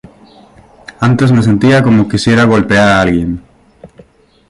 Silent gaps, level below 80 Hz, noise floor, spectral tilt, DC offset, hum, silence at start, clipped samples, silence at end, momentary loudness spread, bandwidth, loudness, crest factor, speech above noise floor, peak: none; -36 dBFS; -43 dBFS; -6.5 dB/octave; under 0.1%; none; 1 s; under 0.1%; 0.65 s; 7 LU; 11.5 kHz; -10 LUFS; 12 dB; 34 dB; 0 dBFS